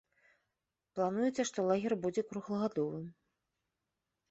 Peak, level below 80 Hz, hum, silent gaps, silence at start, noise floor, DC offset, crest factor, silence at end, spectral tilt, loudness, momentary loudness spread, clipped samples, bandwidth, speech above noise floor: -18 dBFS; -76 dBFS; none; none; 0.95 s; -88 dBFS; under 0.1%; 18 dB; 1.2 s; -6 dB/octave; -35 LUFS; 11 LU; under 0.1%; 8 kHz; 54 dB